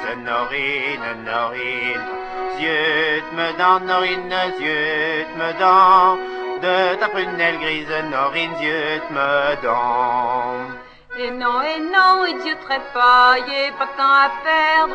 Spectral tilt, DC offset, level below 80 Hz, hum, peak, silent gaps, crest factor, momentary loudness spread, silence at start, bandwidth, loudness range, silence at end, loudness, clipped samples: -4.5 dB/octave; under 0.1%; -54 dBFS; none; 0 dBFS; none; 18 dB; 10 LU; 0 s; 8.8 kHz; 5 LU; 0 s; -18 LUFS; under 0.1%